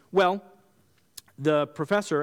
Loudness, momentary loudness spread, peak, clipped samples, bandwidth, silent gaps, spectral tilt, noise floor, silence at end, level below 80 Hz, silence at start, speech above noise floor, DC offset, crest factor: -26 LUFS; 23 LU; -10 dBFS; under 0.1%; 17 kHz; none; -5.5 dB/octave; -65 dBFS; 0 s; -70 dBFS; 0.15 s; 40 dB; under 0.1%; 16 dB